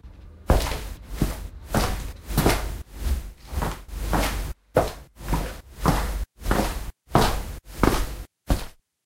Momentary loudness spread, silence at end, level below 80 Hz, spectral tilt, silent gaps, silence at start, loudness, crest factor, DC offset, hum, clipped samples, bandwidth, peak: 13 LU; 0.35 s; -30 dBFS; -5 dB/octave; none; 0.05 s; -27 LUFS; 24 dB; under 0.1%; none; under 0.1%; 16 kHz; -2 dBFS